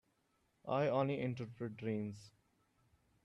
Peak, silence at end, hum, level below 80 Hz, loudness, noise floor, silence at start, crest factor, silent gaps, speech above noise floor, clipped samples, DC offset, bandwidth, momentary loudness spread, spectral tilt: -24 dBFS; 0.95 s; none; -78 dBFS; -39 LUFS; -79 dBFS; 0.65 s; 18 dB; none; 40 dB; under 0.1%; under 0.1%; 10.5 kHz; 14 LU; -8 dB/octave